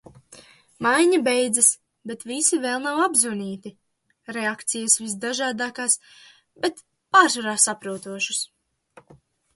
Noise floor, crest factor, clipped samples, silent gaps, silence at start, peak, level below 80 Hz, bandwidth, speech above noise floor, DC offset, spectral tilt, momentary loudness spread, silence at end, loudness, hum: -55 dBFS; 22 dB; under 0.1%; none; 0.3 s; -2 dBFS; -72 dBFS; 12 kHz; 32 dB; under 0.1%; -1.5 dB/octave; 15 LU; 1.1 s; -21 LUFS; none